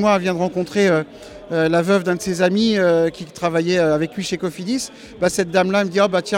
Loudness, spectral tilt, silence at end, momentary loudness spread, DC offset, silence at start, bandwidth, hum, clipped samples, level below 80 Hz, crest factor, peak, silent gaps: -19 LUFS; -5 dB/octave; 0 s; 8 LU; under 0.1%; 0 s; 16.5 kHz; none; under 0.1%; -52 dBFS; 14 dB; -4 dBFS; none